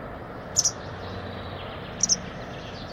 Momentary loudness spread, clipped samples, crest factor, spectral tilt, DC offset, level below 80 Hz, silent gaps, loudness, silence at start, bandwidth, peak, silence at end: 14 LU; under 0.1%; 24 dB; -1.5 dB/octave; under 0.1%; -48 dBFS; none; -27 LUFS; 0 s; 16 kHz; -6 dBFS; 0 s